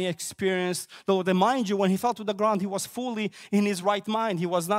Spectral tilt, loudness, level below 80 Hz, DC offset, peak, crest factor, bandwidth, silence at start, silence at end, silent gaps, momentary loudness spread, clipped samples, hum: -5 dB/octave; -26 LUFS; -70 dBFS; under 0.1%; -10 dBFS; 16 dB; 16 kHz; 0 s; 0 s; none; 7 LU; under 0.1%; none